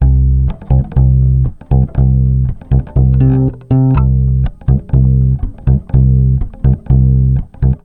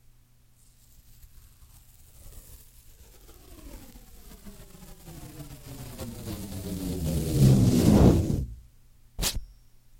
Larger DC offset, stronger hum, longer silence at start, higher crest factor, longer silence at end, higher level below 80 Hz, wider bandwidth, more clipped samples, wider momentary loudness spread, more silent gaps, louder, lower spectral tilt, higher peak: first, 0.8% vs under 0.1%; neither; second, 0 s vs 2.25 s; second, 10 dB vs 24 dB; second, 0.1 s vs 0.55 s; first, -14 dBFS vs -38 dBFS; second, 2.8 kHz vs 17 kHz; neither; second, 5 LU vs 29 LU; neither; first, -12 LUFS vs -24 LUFS; first, -13 dB/octave vs -6.5 dB/octave; first, 0 dBFS vs -6 dBFS